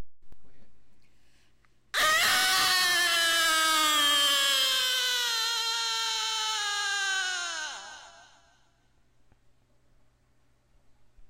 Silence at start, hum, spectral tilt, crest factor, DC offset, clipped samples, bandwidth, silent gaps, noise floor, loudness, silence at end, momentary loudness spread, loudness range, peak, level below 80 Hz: 0 s; none; 2 dB/octave; 14 dB; under 0.1%; under 0.1%; 16 kHz; none; -67 dBFS; -24 LUFS; 0.05 s; 10 LU; 11 LU; -16 dBFS; -64 dBFS